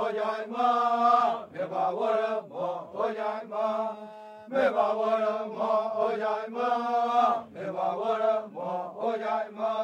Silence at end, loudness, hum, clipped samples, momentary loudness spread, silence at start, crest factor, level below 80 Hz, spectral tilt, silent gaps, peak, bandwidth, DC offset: 0 s; -28 LUFS; none; under 0.1%; 9 LU; 0 s; 18 dB; -80 dBFS; -5.5 dB/octave; none; -10 dBFS; 9.2 kHz; under 0.1%